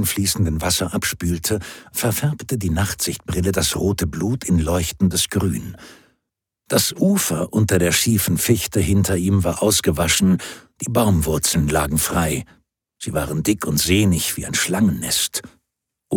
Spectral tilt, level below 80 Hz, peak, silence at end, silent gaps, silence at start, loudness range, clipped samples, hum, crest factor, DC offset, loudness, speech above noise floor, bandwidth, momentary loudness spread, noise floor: -4 dB/octave; -36 dBFS; -2 dBFS; 0 s; none; 0 s; 4 LU; under 0.1%; none; 16 dB; under 0.1%; -19 LUFS; 60 dB; 19 kHz; 7 LU; -79 dBFS